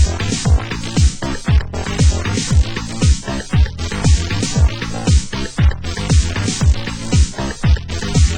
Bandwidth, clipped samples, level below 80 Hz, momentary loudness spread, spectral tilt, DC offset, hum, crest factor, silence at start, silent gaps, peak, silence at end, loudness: 16 kHz; under 0.1%; -18 dBFS; 4 LU; -5 dB/octave; under 0.1%; none; 14 dB; 0 s; none; -2 dBFS; 0 s; -17 LUFS